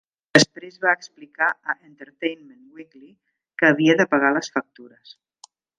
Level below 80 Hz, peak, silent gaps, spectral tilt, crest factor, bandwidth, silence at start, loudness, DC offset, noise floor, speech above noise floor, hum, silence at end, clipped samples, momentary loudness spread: -70 dBFS; 0 dBFS; none; -4 dB/octave; 24 dB; 11 kHz; 0.35 s; -20 LUFS; under 0.1%; -53 dBFS; 31 dB; none; 1.15 s; under 0.1%; 13 LU